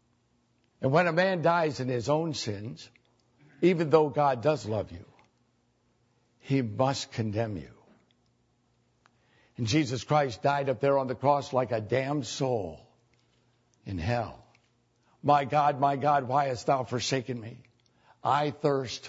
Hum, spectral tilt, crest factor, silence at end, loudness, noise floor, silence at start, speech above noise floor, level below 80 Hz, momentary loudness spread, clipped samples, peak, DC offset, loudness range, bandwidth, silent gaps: 60 Hz at -60 dBFS; -6 dB/octave; 22 dB; 0 s; -28 LUFS; -70 dBFS; 0.8 s; 43 dB; -62 dBFS; 12 LU; under 0.1%; -8 dBFS; under 0.1%; 6 LU; 8 kHz; none